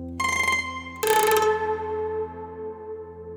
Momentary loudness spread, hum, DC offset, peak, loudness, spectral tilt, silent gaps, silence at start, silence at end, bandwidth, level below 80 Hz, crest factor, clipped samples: 16 LU; none; under 0.1%; -4 dBFS; -24 LUFS; -2.5 dB/octave; none; 0 s; 0 s; over 20 kHz; -56 dBFS; 22 dB; under 0.1%